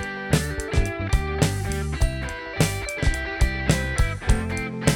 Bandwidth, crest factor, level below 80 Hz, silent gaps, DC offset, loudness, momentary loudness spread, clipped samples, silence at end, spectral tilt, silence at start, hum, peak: 18 kHz; 18 dB; -26 dBFS; none; under 0.1%; -25 LUFS; 4 LU; under 0.1%; 0 s; -5 dB/octave; 0 s; none; -4 dBFS